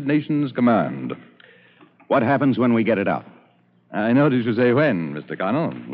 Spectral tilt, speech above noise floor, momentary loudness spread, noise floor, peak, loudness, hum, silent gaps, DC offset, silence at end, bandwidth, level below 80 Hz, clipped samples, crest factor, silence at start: -6.5 dB/octave; 38 dB; 12 LU; -57 dBFS; -6 dBFS; -20 LUFS; 60 Hz at -40 dBFS; none; under 0.1%; 0 s; 5 kHz; -72 dBFS; under 0.1%; 14 dB; 0 s